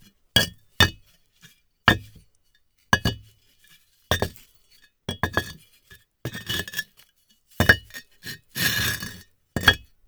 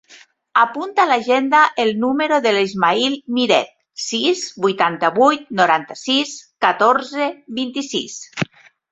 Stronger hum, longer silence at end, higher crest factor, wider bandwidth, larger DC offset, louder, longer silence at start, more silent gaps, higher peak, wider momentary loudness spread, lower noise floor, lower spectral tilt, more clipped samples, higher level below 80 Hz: neither; second, 0.3 s vs 0.5 s; first, 26 dB vs 18 dB; first, over 20 kHz vs 8.4 kHz; neither; second, -23 LUFS vs -17 LUFS; first, 0.35 s vs 0.1 s; neither; about the same, 0 dBFS vs 0 dBFS; first, 19 LU vs 11 LU; first, -64 dBFS vs -48 dBFS; about the same, -3 dB/octave vs -3.5 dB/octave; neither; first, -44 dBFS vs -64 dBFS